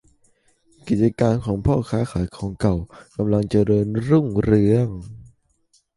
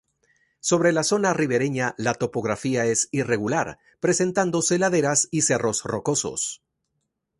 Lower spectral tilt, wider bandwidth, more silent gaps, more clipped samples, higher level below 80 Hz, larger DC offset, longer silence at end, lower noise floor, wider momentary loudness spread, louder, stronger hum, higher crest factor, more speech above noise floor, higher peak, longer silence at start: first, -9 dB/octave vs -4 dB/octave; about the same, 11.5 kHz vs 11.5 kHz; neither; neither; first, -40 dBFS vs -60 dBFS; neither; about the same, 0.75 s vs 0.85 s; second, -63 dBFS vs -77 dBFS; first, 10 LU vs 7 LU; about the same, -21 LUFS vs -23 LUFS; neither; about the same, 18 dB vs 18 dB; second, 44 dB vs 54 dB; about the same, -4 dBFS vs -6 dBFS; first, 0.85 s vs 0.65 s